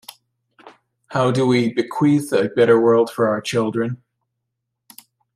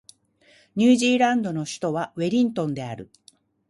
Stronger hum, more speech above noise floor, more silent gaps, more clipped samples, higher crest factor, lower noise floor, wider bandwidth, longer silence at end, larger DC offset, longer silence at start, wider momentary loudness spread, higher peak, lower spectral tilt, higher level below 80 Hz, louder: neither; first, 61 dB vs 36 dB; neither; neither; about the same, 16 dB vs 18 dB; first, -78 dBFS vs -58 dBFS; first, 15.5 kHz vs 11.5 kHz; first, 1.4 s vs 0.65 s; neither; about the same, 0.65 s vs 0.75 s; second, 10 LU vs 15 LU; about the same, -4 dBFS vs -6 dBFS; first, -6.5 dB/octave vs -5 dB/octave; about the same, -64 dBFS vs -66 dBFS; first, -18 LUFS vs -22 LUFS